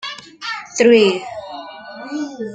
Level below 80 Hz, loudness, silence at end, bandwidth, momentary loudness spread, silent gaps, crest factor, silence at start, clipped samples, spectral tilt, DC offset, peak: -62 dBFS; -16 LUFS; 0 s; 9.2 kHz; 21 LU; none; 18 dB; 0 s; under 0.1%; -3.5 dB/octave; under 0.1%; -2 dBFS